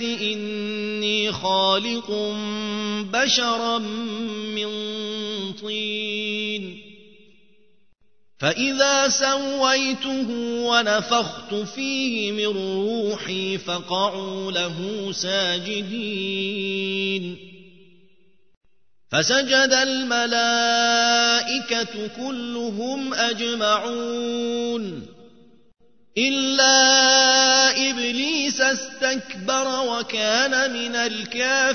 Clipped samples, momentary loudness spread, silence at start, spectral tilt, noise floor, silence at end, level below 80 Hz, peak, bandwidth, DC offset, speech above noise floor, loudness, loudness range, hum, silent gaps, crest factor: under 0.1%; 11 LU; 0 s; -2 dB/octave; -63 dBFS; 0 s; -66 dBFS; -2 dBFS; 6.6 kHz; 0.3%; 41 dB; -21 LUFS; 10 LU; none; 18.57-18.61 s; 20 dB